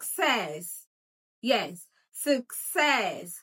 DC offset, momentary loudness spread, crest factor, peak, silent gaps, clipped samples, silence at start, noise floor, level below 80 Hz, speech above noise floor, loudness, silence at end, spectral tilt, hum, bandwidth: under 0.1%; 16 LU; 20 dB; -10 dBFS; 0.87-1.42 s; under 0.1%; 0 s; under -90 dBFS; under -90 dBFS; over 62 dB; -28 LUFS; 0 s; -2 dB/octave; none; 17 kHz